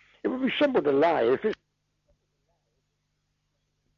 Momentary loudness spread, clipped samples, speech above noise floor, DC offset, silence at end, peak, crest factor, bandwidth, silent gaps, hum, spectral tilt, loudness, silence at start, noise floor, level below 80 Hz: 9 LU; under 0.1%; 53 dB; under 0.1%; 2.45 s; -14 dBFS; 14 dB; 6.8 kHz; none; 50 Hz at -70 dBFS; -7 dB/octave; -25 LUFS; 0.25 s; -76 dBFS; -68 dBFS